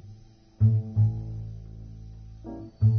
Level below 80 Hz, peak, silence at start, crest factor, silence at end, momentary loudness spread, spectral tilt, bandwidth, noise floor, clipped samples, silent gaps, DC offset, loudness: -46 dBFS; -10 dBFS; 0.05 s; 16 dB; 0 s; 20 LU; -11.5 dB/octave; 1.4 kHz; -51 dBFS; under 0.1%; none; under 0.1%; -26 LUFS